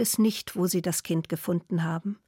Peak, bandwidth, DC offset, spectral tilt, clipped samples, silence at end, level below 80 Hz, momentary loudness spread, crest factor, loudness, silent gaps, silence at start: -14 dBFS; 17 kHz; under 0.1%; -5 dB/octave; under 0.1%; 0.15 s; -68 dBFS; 5 LU; 12 dB; -28 LUFS; none; 0 s